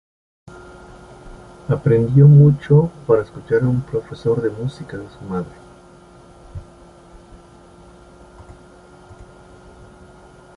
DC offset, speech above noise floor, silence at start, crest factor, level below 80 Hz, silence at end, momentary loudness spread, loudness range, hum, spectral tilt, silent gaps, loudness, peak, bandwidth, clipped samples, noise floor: under 0.1%; 29 dB; 1.25 s; 18 dB; -46 dBFS; 3.95 s; 26 LU; 19 LU; none; -10 dB/octave; none; -16 LUFS; -2 dBFS; 5 kHz; under 0.1%; -45 dBFS